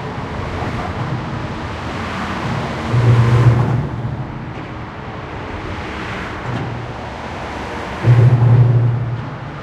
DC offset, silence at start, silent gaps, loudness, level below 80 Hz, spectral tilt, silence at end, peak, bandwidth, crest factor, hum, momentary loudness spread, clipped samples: under 0.1%; 0 s; none; -18 LUFS; -36 dBFS; -7.5 dB/octave; 0 s; 0 dBFS; 8 kHz; 16 dB; none; 16 LU; under 0.1%